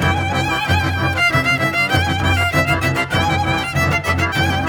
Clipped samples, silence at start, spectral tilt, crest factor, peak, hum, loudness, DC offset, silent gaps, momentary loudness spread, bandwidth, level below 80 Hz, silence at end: under 0.1%; 0 s; -5 dB/octave; 16 dB; -2 dBFS; none; -16 LUFS; under 0.1%; none; 3 LU; over 20 kHz; -34 dBFS; 0 s